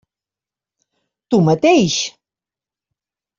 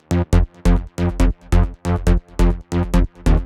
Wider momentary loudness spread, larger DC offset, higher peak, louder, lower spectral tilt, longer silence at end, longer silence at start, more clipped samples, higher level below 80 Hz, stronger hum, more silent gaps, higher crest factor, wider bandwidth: first, 8 LU vs 3 LU; neither; about the same, -2 dBFS vs -2 dBFS; first, -15 LUFS vs -20 LUFS; second, -5 dB/octave vs -7.5 dB/octave; first, 1.3 s vs 0 s; first, 1.3 s vs 0.1 s; neither; second, -58 dBFS vs -18 dBFS; neither; neither; about the same, 18 dB vs 14 dB; second, 7.6 kHz vs 11.5 kHz